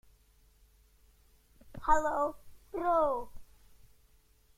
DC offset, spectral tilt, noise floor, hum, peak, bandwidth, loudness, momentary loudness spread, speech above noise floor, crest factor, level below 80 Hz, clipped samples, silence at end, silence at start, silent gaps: under 0.1%; -5.5 dB/octave; -65 dBFS; none; -12 dBFS; 15.5 kHz; -32 LUFS; 18 LU; 36 dB; 22 dB; -50 dBFS; under 0.1%; 1.15 s; 1.65 s; none